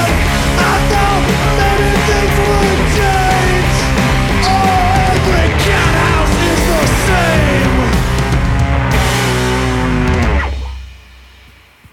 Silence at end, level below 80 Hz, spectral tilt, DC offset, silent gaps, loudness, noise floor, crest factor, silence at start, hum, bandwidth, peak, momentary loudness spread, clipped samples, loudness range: 0.95 s; -18 dBFS; -5 dB/octave; under 0.1%; none; -12 LUFS; -42 dBFS; 12 dB; 0 s; none; 17 kHz; 0 dBFS; 3 LU; under 0.1%; 3 LU